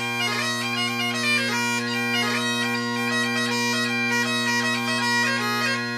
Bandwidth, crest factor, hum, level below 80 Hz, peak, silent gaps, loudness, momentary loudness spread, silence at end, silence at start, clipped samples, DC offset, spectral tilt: 15.5 kHz; 14 dB; none; -74 dBFS; -10 dBFS; none; -22 LUFS; 3 LU; 0 s; 0 s; under 0.1%; under 0.1%; -2.5 dB/octave